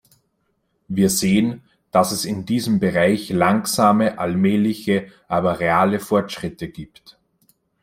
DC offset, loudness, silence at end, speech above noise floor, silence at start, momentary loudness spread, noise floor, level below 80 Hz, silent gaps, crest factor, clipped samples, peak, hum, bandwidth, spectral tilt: under 0.1%; -19 LUFS; 0.95 s; 50 dB; 0.9 s; 12 LU; -69 dBFS; -54 dBFS; none; 18 dB; under 0.1%; -2 dBFS; none; 16.5 kHz; -5 dB/octave